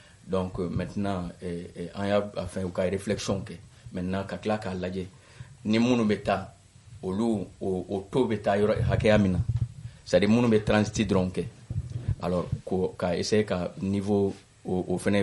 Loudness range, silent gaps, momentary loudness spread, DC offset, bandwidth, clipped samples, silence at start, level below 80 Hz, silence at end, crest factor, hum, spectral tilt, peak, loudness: 6 LU; none; 14 LU; under 0.1%; 11.5 kHz; under 0.1%; 0.25 s; -48 dBFS; 0 s; 20 dB; none; -6.5 dB/octave; -6 dBFS; -28 LUFS